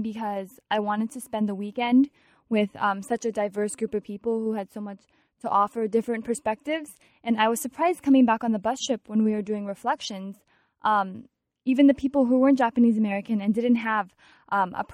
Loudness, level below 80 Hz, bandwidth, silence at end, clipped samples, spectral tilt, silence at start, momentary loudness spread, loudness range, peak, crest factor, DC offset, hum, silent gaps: -25 LUFS; -66 dBFS; 14 kHz; 0 s; under 0.1%; -5 dB/octave; 0 s; 13 LU; 6 LU; -8 dBFS; 18 dB; under 0.1%; none; none